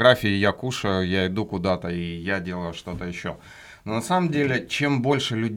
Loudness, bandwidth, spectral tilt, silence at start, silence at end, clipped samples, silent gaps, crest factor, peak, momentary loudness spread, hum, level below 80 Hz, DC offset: -24 LUFS; 17.5 kHz; -5.5 dB/octave; 0 s; 0 s; under 0.1%; none; 22 dB; -2 dBFS; 11 LU; none; -52 dBFS; under 0.1%